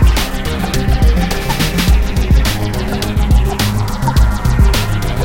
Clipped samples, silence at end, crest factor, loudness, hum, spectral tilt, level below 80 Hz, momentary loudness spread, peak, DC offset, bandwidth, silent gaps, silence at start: under 0.1%; 0 s; 12 dB; -15 LUFS; none; -5 dB/octave; -14 dBFS; 5 LU; 0 dBFS; under 0.1%; 17 kHz; none; 0 s